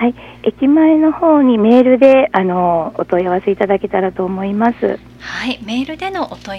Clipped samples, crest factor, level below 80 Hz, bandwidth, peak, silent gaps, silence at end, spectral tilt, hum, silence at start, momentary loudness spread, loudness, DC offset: 0.2%; 14 dB; -46 dBFS; 7.4 kHz; 0 dBFS; none; 0 s; -7.5 dB/octave; 60 Hz at -40 dBFS; 0 s; 12 LU; -14 LUFS; under 0.1%